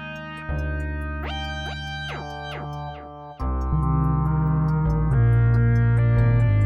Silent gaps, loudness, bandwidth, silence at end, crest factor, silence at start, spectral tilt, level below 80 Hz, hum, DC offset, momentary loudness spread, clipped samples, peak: none; -23 LUFS; 6.6 kHz; 0 s; 12 dB; 0 s; -8 dB/octave; -30 dBFS; none; under 0.1%; 14 LU; under 0.1%; -8 dBFS